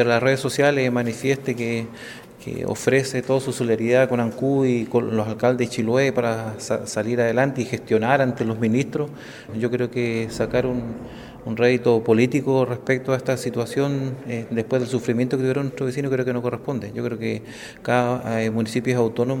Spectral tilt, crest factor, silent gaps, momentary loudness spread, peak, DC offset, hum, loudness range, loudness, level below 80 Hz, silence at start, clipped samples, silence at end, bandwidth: -6 dB/octave; 18 dB; none; 10 LU; -4 dBFS; under 0.1%; none; 3 LU; -22 LUFS; -54 dBFS; 0 s; under 0.1%; 0 s; 17.5 kHz